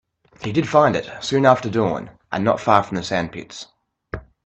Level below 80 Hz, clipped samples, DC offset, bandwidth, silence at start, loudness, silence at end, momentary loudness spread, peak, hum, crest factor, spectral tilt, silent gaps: -50 dBFS; under 0.1%; under 0.1%; 8.6 kHz; 0.4 s; -19 LUFS; 0.25 s; 19 LU; 0 dBFS; none; 20 dB; -6 dB/octave; none